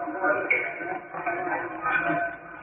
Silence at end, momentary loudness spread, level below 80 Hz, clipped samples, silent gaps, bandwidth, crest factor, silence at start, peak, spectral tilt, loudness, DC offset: 0 s; 9 LU; -64 dBFS; under 0.1%; none; 3.8 kHz; 16 dB; 0 s; -12 dBFS; 2 dB/octave; -27 LUFS; under 0.1%